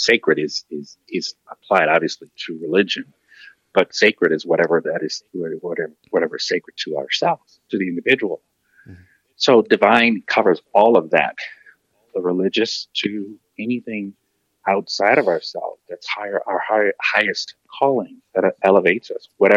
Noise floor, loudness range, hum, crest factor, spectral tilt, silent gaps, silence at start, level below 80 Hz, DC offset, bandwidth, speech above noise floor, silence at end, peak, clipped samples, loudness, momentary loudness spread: -53 dBFS; 6 LU; none; 20 dB; -4 dB/octave; none; 0 s; -68 dBFS; under 0.1%; 8.2 kHz; 34 dB; 0 s; 0 dBFS; under 0.1%; -19 LUFS; 14 LU